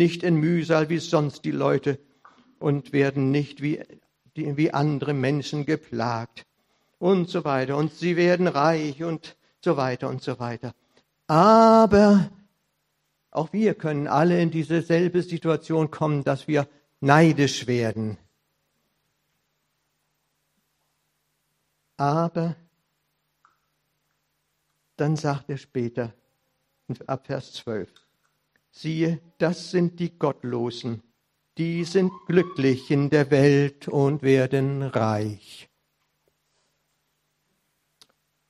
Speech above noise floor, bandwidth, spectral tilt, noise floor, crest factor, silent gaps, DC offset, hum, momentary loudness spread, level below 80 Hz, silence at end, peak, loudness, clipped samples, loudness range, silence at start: 52 dB; 11.5 kHz; -7 dB/octave; -75 dBFS; 24 dB; none; under 0.1%; none; 14 LU; -60 dBFS; 2.85 s; 0 dBFS; -23 LUFS; under 0.1%; 12 LU; 0 s